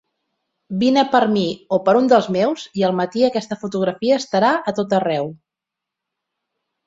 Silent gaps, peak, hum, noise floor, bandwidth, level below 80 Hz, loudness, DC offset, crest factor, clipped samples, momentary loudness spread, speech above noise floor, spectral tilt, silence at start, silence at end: none; -2 dBFS; none; -84 dBFS; 7.8 kHz; -62 dBFS; -18 LUFS; under 0.1%; 18 dB; under 0.1%; 8 LU; 67 dB; -6 dB/octave; 0.7 s; 1.5 s